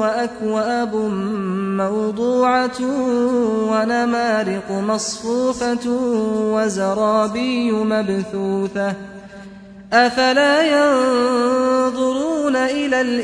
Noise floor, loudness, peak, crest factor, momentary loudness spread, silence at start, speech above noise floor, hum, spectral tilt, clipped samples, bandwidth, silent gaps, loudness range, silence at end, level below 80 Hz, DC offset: -38 dBFS; -18 LUFS; -2 dBFS; 16 dB; 7 LU; 0 s; 20 dB; none; -4.5 dB/octave; under 0.1%; 10.5 kHz; none; 3 LU; 0 s; -54 dBFS; under 0.1%